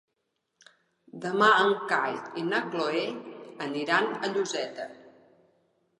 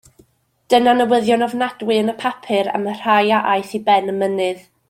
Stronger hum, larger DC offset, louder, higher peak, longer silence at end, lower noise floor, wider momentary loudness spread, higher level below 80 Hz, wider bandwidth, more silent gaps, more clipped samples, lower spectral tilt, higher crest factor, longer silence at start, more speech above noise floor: neither; neither; second, -27 LUFS vs -17 LUFS; second, -10 dBFS vs -2 dBFS; first, 0.9 s vs 0.3 s; first, -80 dBFS vs -58 dBFS; first, 17 LU vs 8 LU; second, -84 dBFS vs -64 dBFS; second, 11 kHz vs 16 kHz; neither; neither; about the same, -4 dB/octave vs -5 dB/octave; about the same, 20 dB vs 16 dB; first, 1.15 s vs 0.7 s; first, 52 dB vs 41 dB